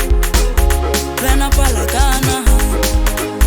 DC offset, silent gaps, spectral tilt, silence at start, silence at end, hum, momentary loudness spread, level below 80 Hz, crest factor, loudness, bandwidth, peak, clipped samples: under 0.1%; none; -4 dB/octave; 0 s; 0 s; none; 2 LU; -14 dBFS; 12 dB; -15 LUFS; over 20 kHz; 0 dBFS; under 0.1%